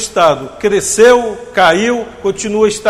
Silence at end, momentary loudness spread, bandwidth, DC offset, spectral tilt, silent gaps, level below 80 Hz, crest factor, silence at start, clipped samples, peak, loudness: 0 s; 10 LU; 15 kHz; under 0.1%; -3 dB/octave; none; -42 dBFS; 12 dB; 0 s; 0.4%; 0 dBFS; -12 LUFS